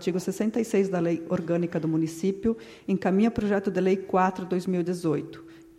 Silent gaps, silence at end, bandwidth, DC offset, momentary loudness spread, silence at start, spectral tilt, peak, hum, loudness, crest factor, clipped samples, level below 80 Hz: none; 0.15 s; 14.5 kHz; under 0.1%; 6 LU; 0 s; -7 dB/octave; -10 dBFS; none; -26 LUFS; 16 dB; under 0.1%; -56 dBFS